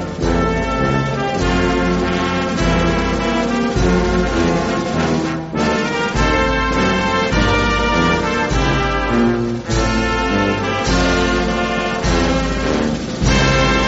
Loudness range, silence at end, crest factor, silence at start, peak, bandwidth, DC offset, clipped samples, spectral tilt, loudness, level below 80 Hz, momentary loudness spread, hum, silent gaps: 1 LU; 0 s; 14 dB; 0 s; -2 dBFS; 8 kHz; under 0.1%; under 0.1%; -4.5 dB/octave; -17 LUFS; -24 dBFS; 3 LU; none; none